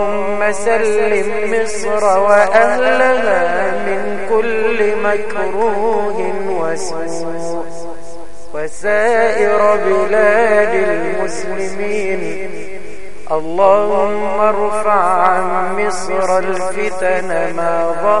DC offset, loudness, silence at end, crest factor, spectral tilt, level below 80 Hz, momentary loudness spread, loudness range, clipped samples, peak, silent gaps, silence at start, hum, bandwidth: 10%; -15 LUFS; 0 s; 16 dB; -4.5 dB/octave; -48 dBFS; 12 LU; 5 LU; under 0.1%; 0 dBFS; none; 0 s; none; 11.5 kHz